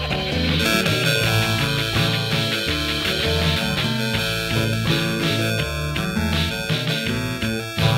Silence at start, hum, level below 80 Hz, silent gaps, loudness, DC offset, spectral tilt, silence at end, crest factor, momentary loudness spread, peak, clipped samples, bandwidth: 0 s; none; -36 dBFS; none; -20 LUFS; under 0.1%; -4.5 dB/octave; 0 s; 18 dB; 5 LU; -2 dBFS; under 0.1%; 16 kHz